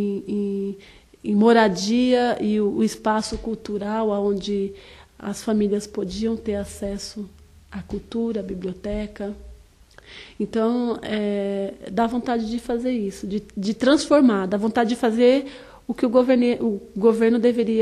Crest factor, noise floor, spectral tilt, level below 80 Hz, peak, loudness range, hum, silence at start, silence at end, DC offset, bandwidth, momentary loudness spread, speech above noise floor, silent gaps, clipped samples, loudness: 18 dB; -50 dBFS; -5.5 dB/octave; -48 dBFS; -4 dBFS; 9 LU; none; 0 s; 0 s; under 0.1%; 12.5 kHz; 15 LU; 28 dB; none; under 0.1%; -22 LUFS